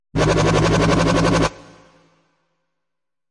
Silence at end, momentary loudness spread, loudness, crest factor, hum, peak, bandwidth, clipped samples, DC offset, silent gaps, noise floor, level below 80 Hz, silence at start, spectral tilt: 1.75 s; 3 LU; -17 LUFS; 16 dB; none; -4 dBFS; 11.5 kHz; under 0.1%; under 0.1%; none; -85 dBFS; -34 dBFS; 0.15 s; -5.5 dB/octave